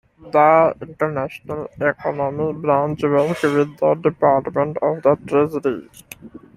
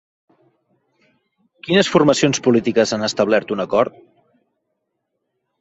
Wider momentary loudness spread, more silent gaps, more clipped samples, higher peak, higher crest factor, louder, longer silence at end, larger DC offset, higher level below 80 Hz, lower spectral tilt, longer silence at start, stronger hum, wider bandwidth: first, 13 LU vs 5 LU; neither; neither; about the same, -2 dBFS vs 0 dBFS; about the same, 18 dB vs 20 dB; about the same, -19 LUFS vs -17 LUFS; second, 0.2 s vs 1.7 s; neither; about the same, -56 dBFS vs -58 dBFS; first, -7.5 dB/octave vs -4.5 dB/octave; second, 0.25 s vs 1.65 s; neither; first, 14.5 kHz vs 8.2 kHz